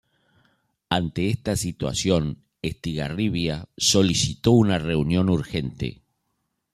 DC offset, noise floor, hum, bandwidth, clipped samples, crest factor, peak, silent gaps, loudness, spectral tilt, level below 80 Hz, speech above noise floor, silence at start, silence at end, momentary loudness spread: under 0.1%; -76 dBFS; none; 15 kHz; under 0.1%; 20 dB; -4 dBFS; none; -23 LUFS; -5 dB/octave; -46 dBFS; 53 dB; 0.9 s; 0.85 s; 12 LU